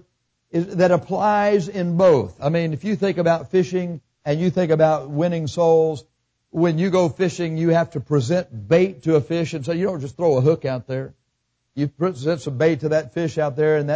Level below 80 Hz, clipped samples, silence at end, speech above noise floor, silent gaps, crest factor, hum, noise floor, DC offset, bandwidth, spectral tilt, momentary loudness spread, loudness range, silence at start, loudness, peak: -56 dBFS; under 0.1%; 0 s; 53 dB; none; 14 dB; none; -73 dBFS; under 0.1%; 8 kHz; -7.5 dB/octave; 9 LU; 3 LU; 0.55 s; -20 LUFS; -6 dBFS